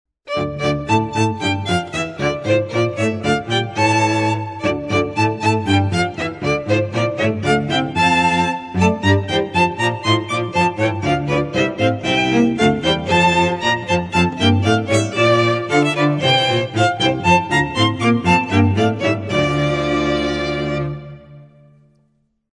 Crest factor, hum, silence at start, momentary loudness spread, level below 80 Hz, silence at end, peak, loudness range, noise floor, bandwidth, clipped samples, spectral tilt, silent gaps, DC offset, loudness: 16 dB; none; 0.25 s; 6 LU; -44 dBFS; 1.05 s; -2 dBFS; 3 LU; -63 dBFS; 11 kHz; under 0.1%; -5.5 dB/octave; none; under 0.1%; -17 LUFS